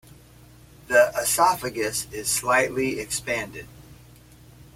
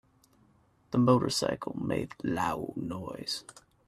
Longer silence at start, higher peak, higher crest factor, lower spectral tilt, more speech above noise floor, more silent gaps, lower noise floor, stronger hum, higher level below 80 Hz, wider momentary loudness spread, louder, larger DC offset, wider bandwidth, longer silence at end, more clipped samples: about the same, 0.9 s vs 0.9 s; first, -6 dBFS vs -10 dBFS; about the same, 20 dB vs 22 dB; second, -2.5 dB/octave vs -5.5 dB/octave; second, 26 dB vs 35 dB; neither; second, -50 dBFS vs -65 dBFS; neither; first, -52 dBFS vs -62 dBFS; second, 9 LU vs 13 LU; first, -23 LUFS vs -31 LUFS; neither; first, 16.5 kHz vs 14 kHz; first, 0.8 s vs 0.35 s; neither